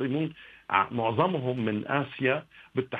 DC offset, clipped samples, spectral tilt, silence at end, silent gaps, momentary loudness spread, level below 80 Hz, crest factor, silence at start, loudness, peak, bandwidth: under 0.1%; under 0.1%; -9 dB/octave; 0 s; none; 8 LU; -68 dBFS; 22 dB; 0 s; -28 LUFS; -8 dBFS; 4.9 kHz